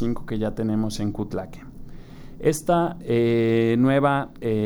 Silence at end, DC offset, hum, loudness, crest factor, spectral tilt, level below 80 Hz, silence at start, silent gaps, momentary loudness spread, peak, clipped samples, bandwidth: 0 s; under 0.1%; none; -23 LUFS; 16 dB; -7 dB/octave; -42 dBFS; 0 s; none; 11 LU; -8 dBFS; under 0.1%; over 20 kHz